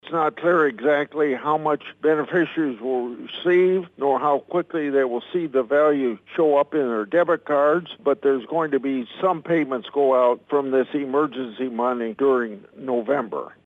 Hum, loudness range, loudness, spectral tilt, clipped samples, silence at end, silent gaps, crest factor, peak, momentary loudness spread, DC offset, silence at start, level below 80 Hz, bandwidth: none; 2 LU; -22 LUFS; -8 dB/octave; under 0.1%; 0.2 s; none; 16 dB; -6 dBFS; 7 LU; under 0.1%; 0.05 s; -76 dBFS; 4 kHz